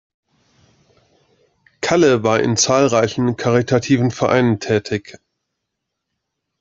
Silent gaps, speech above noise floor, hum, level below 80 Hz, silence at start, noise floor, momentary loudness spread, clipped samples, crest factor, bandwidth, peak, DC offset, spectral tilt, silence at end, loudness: none; 62 dB; none; -54 dBFS; 1.8 s; -78 dBFS; 6 LU; under 0.1%; 16 dB; 8.2 kHz; -2 dBFS; under 0.1%; -5 dB/octave; 1.5 s; -16 LUFS